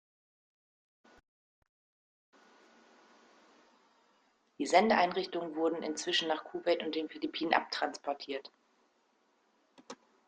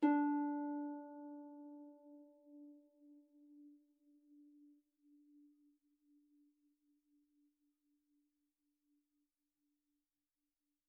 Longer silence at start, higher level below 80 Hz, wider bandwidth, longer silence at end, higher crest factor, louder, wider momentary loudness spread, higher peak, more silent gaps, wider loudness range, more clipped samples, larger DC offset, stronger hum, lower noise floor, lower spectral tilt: first, 4.6 s vs 0 s; first, -80 dBFS vs under -90 dBFS; first, 9.4 kHz vs 2.7 kHz; second, 0.35 s vs 6.45 s; about the same, 28 dB vs 24 dB; first, -33 LUFS vs -42 LUFS; second, 13 LU vs 28 LU; first, -10 dBFS vs -22 dBFS; neither; second, 6 LU vs 23 LU; neither; neither; neither; second, -73 dBFS vs under -90 dBFS; first, -3 dB/octave vs 1.5 dB/octave